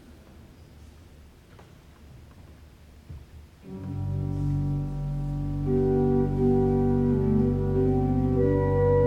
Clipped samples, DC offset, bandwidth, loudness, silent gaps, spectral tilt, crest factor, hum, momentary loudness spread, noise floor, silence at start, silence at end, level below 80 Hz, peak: under 0.1%; under 0.1%; 6 kHz; -25 LUFS; none; -10.5 dB/octave; 14 dB; none; 15 LU; -50 dBFS; 0.1 s; 0 s; -38 dBFS; -12 dBFS